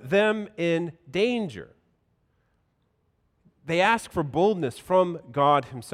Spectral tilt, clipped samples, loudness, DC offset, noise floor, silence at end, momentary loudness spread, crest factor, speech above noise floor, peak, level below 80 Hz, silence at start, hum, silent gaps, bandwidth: -5.5 dB/octave; under 0.1%; -25 LUFS; under 0.1%; -71 dBFS; 0 s; 9 LU; 18 dB; 46 dB; -8 dBFS; -62 dBFS; 0 s; none; none; 15 kHz